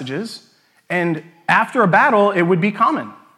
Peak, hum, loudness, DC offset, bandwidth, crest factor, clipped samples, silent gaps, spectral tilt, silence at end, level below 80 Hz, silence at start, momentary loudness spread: 0 dBFS; none; -17 LUFS; under 0.1%; 12.5 kHz; 16 dB; under 0.1%; none; -6.5 dB/octave; 0.25 s; -74 dBFS; 0 s; 14 LU